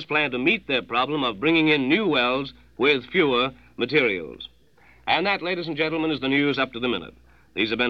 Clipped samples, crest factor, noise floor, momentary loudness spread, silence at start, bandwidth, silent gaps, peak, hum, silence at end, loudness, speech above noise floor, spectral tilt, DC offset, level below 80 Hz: under 0.1%; 18 dB; -56 dBFS; 10 LU; 0 s; 6.4 kHz; none; -6 dBFS; none; 0 s; -22 LUFS; 33 dB; -6.5 dB/octave; 0.1%; -56 dBFS